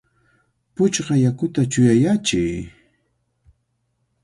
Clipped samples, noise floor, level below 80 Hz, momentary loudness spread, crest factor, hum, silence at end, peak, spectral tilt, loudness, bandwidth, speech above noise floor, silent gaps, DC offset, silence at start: under 0.1%; -70 dBFS; -48 dBFS; 15 LU; 18 dB; none; 1.55 s; -4 dBFS; -5.5 dB/octave; -19 LUFS; 11.5 kHz; 52 dB; none; under 0.1%; 0.8 s